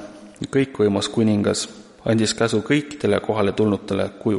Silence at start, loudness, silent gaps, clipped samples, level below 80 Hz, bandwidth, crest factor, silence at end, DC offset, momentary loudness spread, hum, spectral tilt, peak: 0 s; -21 LUFS; none; under 0.1%; -54 dBFS; 11.5 kHz; 16 dB; 0 s; under 0.1%; 7 LU; none; -5.5 dB/octave; -4 dBFS